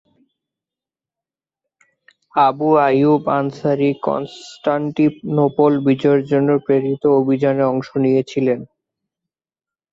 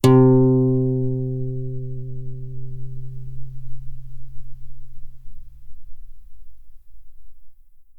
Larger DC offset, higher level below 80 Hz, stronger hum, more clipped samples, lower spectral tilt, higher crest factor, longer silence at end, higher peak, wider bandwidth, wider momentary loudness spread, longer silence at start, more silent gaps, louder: neither; second, -62 dBFS vs -38 dBFS; neither; neither; about the same, -8.5 dB/octave vs -8.5 dB/octave; about the same, 16 dB vs 18 dB; first, 1.25 s vs 0 s; about the same, -2 dBFS vs -2 dBFS; second, 7.6 kHz vs 15 kHz; second, 7 LU vs 27 LU; first, 2.35 s vs 0.05 s; neither; first, -17 LUFS vs -20 LUFS